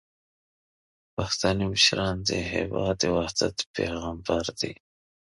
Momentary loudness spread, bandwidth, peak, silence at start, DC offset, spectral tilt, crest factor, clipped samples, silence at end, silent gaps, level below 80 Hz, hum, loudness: 12 LU; 11.5 kHz; -6 dBFS; 1.2 s; under 0.1%; -3.5 dB/octave; 22 dB; under 0.1%; 0.65 s; 3.66-3.74 s; -46 dBFS; none; -26 LUFS